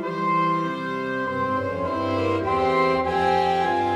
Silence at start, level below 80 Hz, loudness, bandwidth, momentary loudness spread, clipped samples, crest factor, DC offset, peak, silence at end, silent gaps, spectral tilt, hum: 0 s; -50 dBFS; -23 LUFS; 12 kHz; 6 LU; under 0.1%; 14 dB; under 0.1%; -10 dBFS; 0 s; none; -6.5 dB/octave; none